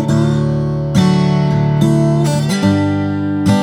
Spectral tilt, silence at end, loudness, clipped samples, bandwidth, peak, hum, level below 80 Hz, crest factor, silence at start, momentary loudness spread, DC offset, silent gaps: -7 dB/octave; 0 s; -14 LUFS; under 0.1%; 12.5 kHz; 0 dBFS; none; -38 dBFS; 12 dB; 0 s; 4 LU; under 0.1%; none